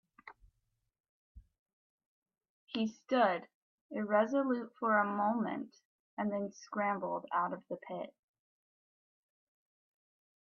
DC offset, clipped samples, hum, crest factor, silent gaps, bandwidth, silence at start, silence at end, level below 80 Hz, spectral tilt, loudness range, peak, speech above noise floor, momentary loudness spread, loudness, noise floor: under 0.1%; under 0.1%; none; 20 dB; 1.00-1.35 s, 1.59-1.66 s, 1.73-1.98 s, 2.06-2.22 s, 2.49-2.67 s, 3.54-3.90 s, 5.85-6.17 s; 7 kHz; 0.25 s; 2.35 s; -74 dBFS; -6 dB/octave; 9 LU; -18 dBFS; 48 dB; 14 LU; -35 LUFS; -82 dBFS